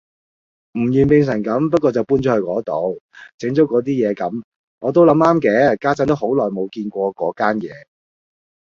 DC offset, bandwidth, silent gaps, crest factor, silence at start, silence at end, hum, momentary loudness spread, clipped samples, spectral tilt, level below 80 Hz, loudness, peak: under 0.1%; 7.4 kHz; 3.01-3.09 s, 3.34-3.38 s, 4.44-4.78 s; 16 dB; 0.75 s; 0.95 s; none; 11 LU; under 0.1%; -8 dB/octave; -52 dBFS; -17 LUFS; -2 dBFS